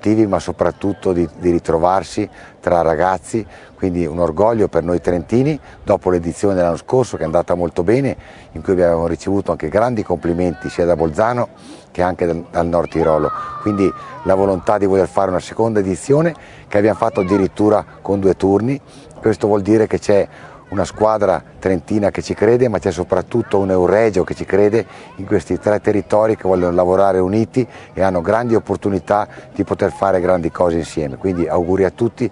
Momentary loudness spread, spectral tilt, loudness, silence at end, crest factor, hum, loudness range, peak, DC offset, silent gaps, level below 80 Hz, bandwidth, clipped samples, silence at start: 7 LU; -7 dB/octave; -17 LUFS; 0 s; 16 dB; none; 2 LU; 0 dBFS; under 0.1%; none; -44 dBFS; 11 kHz; under 0.1%; 0.05 s